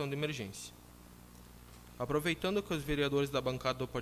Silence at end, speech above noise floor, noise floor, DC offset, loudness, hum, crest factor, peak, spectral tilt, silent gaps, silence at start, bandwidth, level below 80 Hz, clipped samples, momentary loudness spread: 0 s; 20 dB; -55 dBFS; under 0.1%; -35 LUFS; 60 Hz at -55 dBFS; 16 dB; -20 dBFS; -5 dB/octave; none; 0 s; 16 kHz; -56 dBFS; under 0.1%; 23 LU